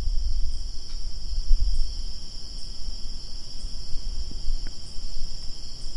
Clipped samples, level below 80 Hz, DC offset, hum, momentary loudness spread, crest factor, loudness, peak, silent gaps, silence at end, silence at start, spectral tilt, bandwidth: under 0.1%; -26 dBFS; under 0.1%; none; 9 LU; 18 dB; -35 LUFS; -4 dBFS; none; 0 s; 0 s; -3.5 dB/octave; 10.5 kHz